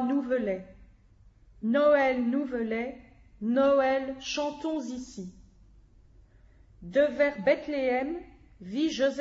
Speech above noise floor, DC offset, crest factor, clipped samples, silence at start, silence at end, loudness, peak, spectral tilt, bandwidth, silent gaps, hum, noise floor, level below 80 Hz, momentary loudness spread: 31 dB; under 0.1%; 18 dB; under 0.1%; 0 s; 0 s; -28 LUFS; -12 dBFS; -5 dB/octave; 7.8 kHz; none; none; -58 dBFS; -58 dBFS; 15 LU